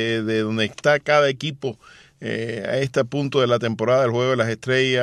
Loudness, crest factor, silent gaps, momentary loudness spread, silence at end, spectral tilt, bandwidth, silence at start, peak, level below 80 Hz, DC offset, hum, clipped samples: -21 LUFS; 16 dB; none; 9 LU; 0 s; -5.5 dB/octave; 11 kHz; 0 s; -4 dBFS; -62 dBFS; under 0.1%; none; under 0.1%